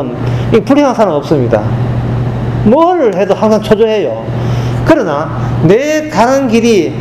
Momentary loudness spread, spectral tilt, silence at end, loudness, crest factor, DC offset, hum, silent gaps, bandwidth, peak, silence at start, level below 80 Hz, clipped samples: 7 LU; -7 dB/octave; 0 s; -11 LUFS; 10 dB; under 0.1%; none; none; 13 kHz; 0 dBFS; 0 s; -30 dBFS; 0.7%